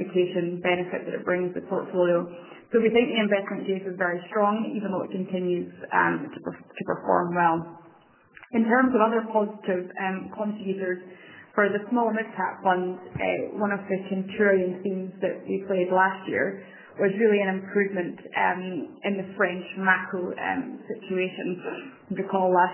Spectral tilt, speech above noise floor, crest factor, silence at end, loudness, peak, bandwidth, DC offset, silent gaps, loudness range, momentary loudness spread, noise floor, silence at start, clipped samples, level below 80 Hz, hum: -10 dB/octave; 30 dB; 20 dB; 0 s; -26 LUFS; -6 dBFS; 3.2 kHz; under 0.1%; none; 2 LU; 10 LU; -56 dBFS; 0 s; under 0.1%; -66 dBFS; none